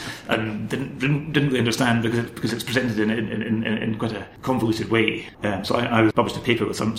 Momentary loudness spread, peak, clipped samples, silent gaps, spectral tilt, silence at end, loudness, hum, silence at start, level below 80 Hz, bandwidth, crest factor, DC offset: 7 LU; -4 dBFS; under 0.1%; none; -5.5 dB/octave; 0 s; -23 LUFS; none; 0 s; -50 dBFS; 16 kHz; 18 dB; under 0.1%